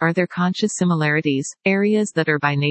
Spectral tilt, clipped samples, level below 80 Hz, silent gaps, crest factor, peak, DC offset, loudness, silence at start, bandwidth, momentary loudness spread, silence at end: -5.5 dB/octave; under 0.1%; -68 dBFS; none; 16 dB; -2 dBFS; under 0.1%; -19 LUFS; 0 s; 8.8 kHz; 3 LU; 0 s